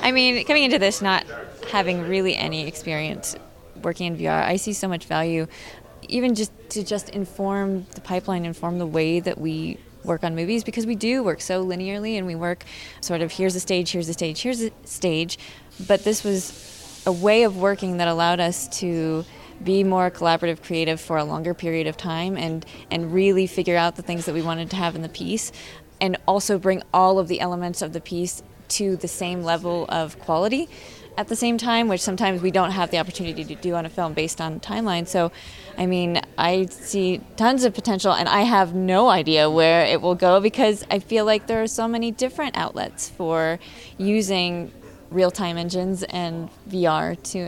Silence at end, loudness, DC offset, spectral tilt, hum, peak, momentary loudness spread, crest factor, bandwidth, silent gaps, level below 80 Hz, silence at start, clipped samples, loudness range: 0 s; -22 LUFS; under 0.1%; -4.5 dB/octave; none; -2 dBFS; 12 LU; 22 dB; 16.5 kHz; none; -52 dBFS; 0 s; under 0.1%; 7 LU